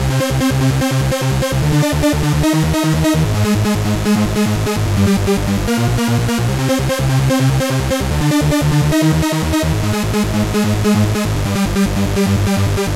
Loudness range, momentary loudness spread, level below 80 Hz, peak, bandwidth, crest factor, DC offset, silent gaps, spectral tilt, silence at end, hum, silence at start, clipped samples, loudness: 1 LU; 3 LU; -26 dBFS; -4 dBFS; 16 kHz; 10 dB; under 0.1%; none; -5.5 dB/octave; 0 s; none; 0 s; under 0.1%; -15 LUFS